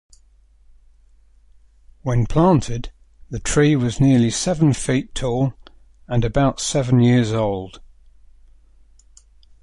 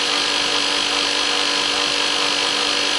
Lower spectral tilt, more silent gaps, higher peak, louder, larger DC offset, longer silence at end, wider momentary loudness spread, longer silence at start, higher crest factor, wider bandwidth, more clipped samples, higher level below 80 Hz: first, -6 dB/octave vs 0 dB/octave; neither; about the same, -4 dBFS vs -4 dBFS; about the same, -19 LUFS vs -17 LUFS; neither; first, 1.85 s vs 0 s; first, 14 LU vs 0 LU; first, 2.05 s vs 0 s; about the same, 18 dB vs 16 dB; about the same, 11.5 kHz vs 11.5 kHz; neither; first, -38 dBFS vs -54 dBFS